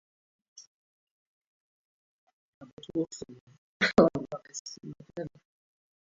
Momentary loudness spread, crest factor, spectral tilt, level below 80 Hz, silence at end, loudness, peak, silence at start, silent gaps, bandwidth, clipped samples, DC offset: 22 LU; 28 dB; -4 dB/octave; -64 dBFS; 0.75 s; -30 LUFS; -6 dBFS; 0.6 s; 0.67-2.27 s, 2.33-2.61 s, 2.73-2.77 s, 3.41-3.47 s, 3.58-3.80 s, 4.59-4.65 s; 7.6 kHz; under 0.1%; under 0.1%